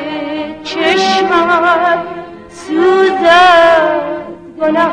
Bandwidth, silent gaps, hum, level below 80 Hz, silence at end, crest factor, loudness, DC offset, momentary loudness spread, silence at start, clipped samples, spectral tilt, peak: 10.5 kHz; none; none; -48 dBFS; 0 s; 12 dB; -10 LUFS; under 0.1%; 18 LU; 0 s; under 0.1%; -4 dB/octave; 0 dBFS